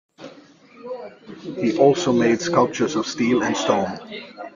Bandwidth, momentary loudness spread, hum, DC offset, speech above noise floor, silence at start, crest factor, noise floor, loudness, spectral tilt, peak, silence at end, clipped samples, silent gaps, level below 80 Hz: 7.4 kHz; 18 LU; none; under 0.1%; 28 dB; 0.2 s; 20 dB; -48 dBFS; -20 LUFS; -5 dB/octave; -2 dBFS; 0.05 s; under 0.1%; none; -62 dBFS